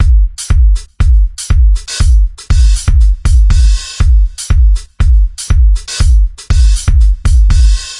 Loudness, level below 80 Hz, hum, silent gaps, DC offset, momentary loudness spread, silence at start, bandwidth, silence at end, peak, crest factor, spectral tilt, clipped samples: -12 LUFS; -8 dBFS; none; none; under 0.1%; 4 LU; 0 s; 11.5 kHz; 0 s; 0 dBFS; 8 dB; -4.5 dB/octave; under 0.1%